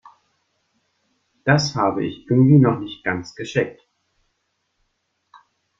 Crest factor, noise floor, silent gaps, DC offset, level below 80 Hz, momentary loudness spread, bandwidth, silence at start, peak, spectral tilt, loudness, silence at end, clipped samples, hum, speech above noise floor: 20 dB; -72 dBFS; none; under 0.1%; -58 dBFS; 13 LU; 7.6 kHz; 1.45 s; -2 dBFS; -6.5 dB/octave; -19 LUFS; 2.1 s; under 0.1%; none; 54 dB